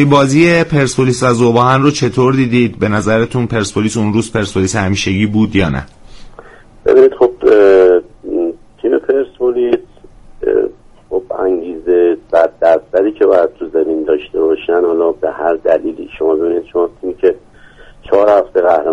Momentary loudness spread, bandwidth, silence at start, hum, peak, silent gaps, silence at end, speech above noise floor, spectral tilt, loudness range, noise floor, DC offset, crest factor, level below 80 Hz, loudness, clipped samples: 9 LU; 11.5 kHz; 0 s; none; 0 dBFS; none; 0 s; 27 dB; -6 dB/octave; 5 LU; -39 dBFS; under 0.1%; 12 dB; -40 dBFS; -13 LUFS; under 0.1%